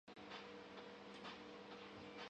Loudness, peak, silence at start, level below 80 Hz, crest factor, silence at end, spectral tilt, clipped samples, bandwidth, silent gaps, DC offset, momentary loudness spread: -55 LUFS; -42 dBFS; 0.05 s; -82 dBFS; 14 dB; 0 s; -4.5 dB/octave; under 0.1%; 9.4 kHz; none; under 0.1%; 2 LU